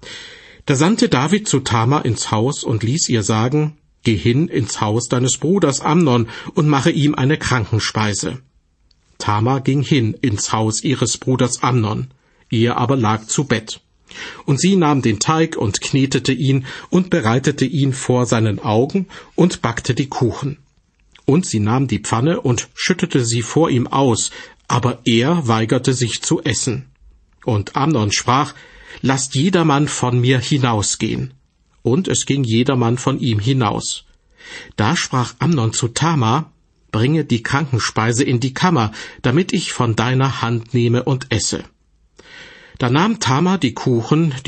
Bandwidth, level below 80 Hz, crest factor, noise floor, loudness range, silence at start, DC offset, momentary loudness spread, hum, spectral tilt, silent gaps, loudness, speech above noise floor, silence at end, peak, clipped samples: 8.8 kHz; -48 dBFS; 16 dB; -58 dBFS; 3 LU; 0 s; under 0.1%; 8 LU; none; -5 dB/octave; none; -17 LUFS; 41 dB; 0.05 s; -2 dBFS; under 0.1%